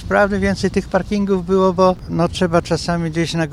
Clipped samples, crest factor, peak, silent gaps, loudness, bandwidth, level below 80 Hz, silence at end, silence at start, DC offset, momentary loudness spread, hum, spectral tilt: under 0.1%; 16 dB; 0 dBFS; none; -17 LUFS; 12 kHz; -36 dBFS; 0 s; 0 s; under 0.1%; 5 LU; none; -6 dB/octave